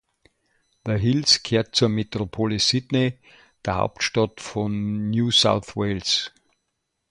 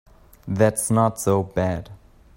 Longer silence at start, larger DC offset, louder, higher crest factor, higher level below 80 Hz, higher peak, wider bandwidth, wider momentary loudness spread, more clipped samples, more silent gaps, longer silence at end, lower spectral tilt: first, 0.85 s vs 0.45 s; neither; about the same, -22 LUFS vs -22 LUFS; about the same, 20 dB vs 20 dB; about the same, -50 dBFS vs -48 dBFS; about the same, -4 dBFS vs -2 dBFS; second, 11 kHz vs 16.5 kHz; about the same, 10 LU vs 12 LU; neither; neither; first, 0.85 s vs 0.4 s; second, -4.5 dB/octave vs -6 dB/octave